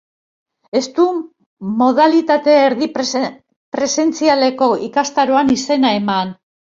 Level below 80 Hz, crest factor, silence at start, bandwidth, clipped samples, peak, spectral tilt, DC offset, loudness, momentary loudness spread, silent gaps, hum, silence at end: -58 dBFS; 14 dB; 0.75 s; 7.8 kHz; under 0.1%; -2 dBFS; -4 dB/octave; under 0.1%; -15 LUFS; 10 LU; 1.46-1.57 s, 3.56-3.72 s; none; 0.35 s